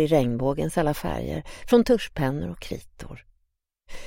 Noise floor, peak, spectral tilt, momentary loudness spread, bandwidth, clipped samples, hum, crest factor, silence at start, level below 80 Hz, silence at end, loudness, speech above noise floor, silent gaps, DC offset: -74 dBFS; -6 dBFS; -6.5 dB/octave; 17 LU; 16.5 kHz; under 0.1%; none; 18 dB; 0 s; -42 dBFS; 0 s; -25 LUFS; 50 dB; none; under 0.1%